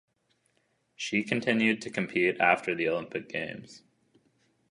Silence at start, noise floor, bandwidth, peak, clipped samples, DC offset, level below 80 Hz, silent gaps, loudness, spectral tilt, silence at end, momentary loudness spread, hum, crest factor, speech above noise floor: 1 s; -73 dBFS; 11 kHz; -8 dBFS; under 0.1%; under 0.1%; -72 dBFS; none; -28 LUFS; -5 dB/octave; 0.95 s; 11 LU; none; 24 dB; 44 dB